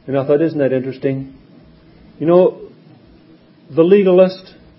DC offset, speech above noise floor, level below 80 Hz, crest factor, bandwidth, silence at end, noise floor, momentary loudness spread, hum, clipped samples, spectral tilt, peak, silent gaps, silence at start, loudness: under 0.1%; 33 dB; -56 dBFS; 16 dB; 5.8 kHz; 0.35 s; -46 dBFS; 13 LU; none; under 0.1%; -12 dB/octave; 0 dBFS; none; 0.05 s; -15 LUFS